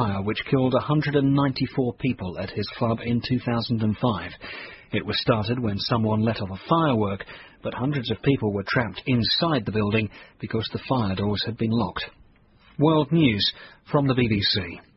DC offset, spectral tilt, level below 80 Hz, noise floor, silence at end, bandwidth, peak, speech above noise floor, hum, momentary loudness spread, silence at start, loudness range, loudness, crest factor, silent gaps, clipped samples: under 0.1%; -9.5 dB/octave; -48 dBFS; -55 dBFS; 0.15 s; 6 kHz; -8 dBFS; 31 dB; none; 10 LU; 0 s; 3 LU; -24 LUFS; 18 dB; none; under 0.1%